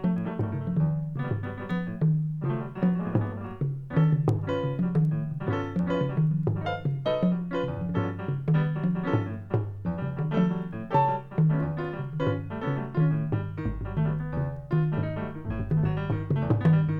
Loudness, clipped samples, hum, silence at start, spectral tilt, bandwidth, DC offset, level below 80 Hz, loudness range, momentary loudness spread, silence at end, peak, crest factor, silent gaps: -28 LUFS; under 0.1%; none; 0 s; -10 dB/octave; 4.8 kHz; under 0.1%; -48 dBFS; 2 LU; 7 LU; 0 s; -10 dBFS; 18 dB; none